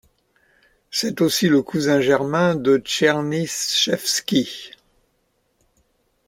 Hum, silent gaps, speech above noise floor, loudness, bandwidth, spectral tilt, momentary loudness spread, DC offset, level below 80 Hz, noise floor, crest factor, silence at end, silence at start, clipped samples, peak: none; none; 48 dB; -19 LUFS; 16.5 kHz; -4 dB/octave; 7 LU; under 0.1%; -60 dBFS; -67 dBFS; 20 dB; 1.6 s; 0.9 s; under 0.1%; -2 dBFS